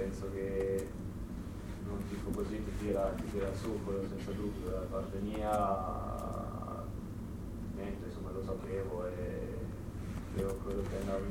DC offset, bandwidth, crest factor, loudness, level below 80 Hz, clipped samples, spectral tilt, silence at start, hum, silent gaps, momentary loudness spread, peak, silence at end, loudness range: under 0.1%; 17.5 kHz; 16 dB; -39 LUFS; -46 dBFS; under 0.1%; -7.5 dB/octave; 0 s; none; none; 9 LU; -20 dBFS; 0 s; 4 LU